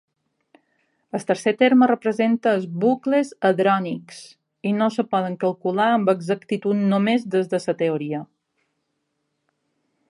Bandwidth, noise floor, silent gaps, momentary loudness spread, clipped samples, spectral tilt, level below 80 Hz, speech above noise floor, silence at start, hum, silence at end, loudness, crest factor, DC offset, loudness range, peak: 11.5 kHz; -75 dBFS; none; 12 LU; under 0.1%; -6.5 dB/octave; -74 dBFS; 54 dB; 1.15 s; none; 1.85 s; -21 LUFS; 18 dB; under 0.1%; 4 LU; -4 dBFS